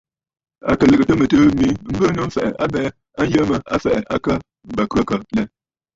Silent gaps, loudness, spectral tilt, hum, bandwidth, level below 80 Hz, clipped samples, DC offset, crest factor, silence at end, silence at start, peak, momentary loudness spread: none; -18 LUFS; -7 dB/octave; none; 7.8 kHz; -40 dBFS; under 0.1%; under 0.1%; 16 dB; 0.5 s; 0.65 s; -2 dBFS; 10 LU